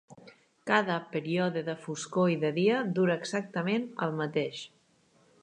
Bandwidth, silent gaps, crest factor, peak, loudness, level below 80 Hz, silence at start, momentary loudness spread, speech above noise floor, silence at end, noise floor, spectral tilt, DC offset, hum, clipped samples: 10.5 kHz; none; 22 dB; -8 dBFS; -30 LUFS; -78 dBFS; 0.1 s; 10 LU; 36 dB; 0.75 s; -66 dBFS; -5.5 dB/octave; under 0.1%; none; under 0.1%